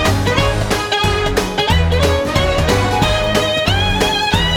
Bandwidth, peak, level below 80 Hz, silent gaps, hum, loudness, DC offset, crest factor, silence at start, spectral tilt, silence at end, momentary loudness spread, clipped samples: 19 kHz; -2 dBFS; -24 dBFS; none; none; -15 LUFS; under 0.1%; 14 dB; 0 s; -4.5 dB/octave; 0 s; 2 LU; under 0.1%